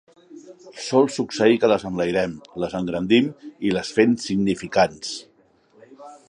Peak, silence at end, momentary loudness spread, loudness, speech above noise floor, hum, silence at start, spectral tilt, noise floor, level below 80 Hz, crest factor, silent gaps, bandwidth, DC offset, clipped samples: -2 dBFS; 0.15 s; 11 LU; -21 LUFS; 37 dB; none; 0.3 s; -5 dB/octave; -58 dBFS; -56 dBFS; 20 dB; none; 10.5 kHz; under 0.1%; under 0.1%